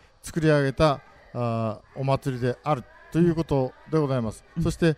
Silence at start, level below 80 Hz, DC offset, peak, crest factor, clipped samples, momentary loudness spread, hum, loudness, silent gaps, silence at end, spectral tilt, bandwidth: 0.25 s; -46 dBFS; under 0.1%; -6 dBFS; 18 dB; under 0.1%; 10 LU; none; -26 LUFS; none; 0 s; -7 dB/octave; 14.5 kHz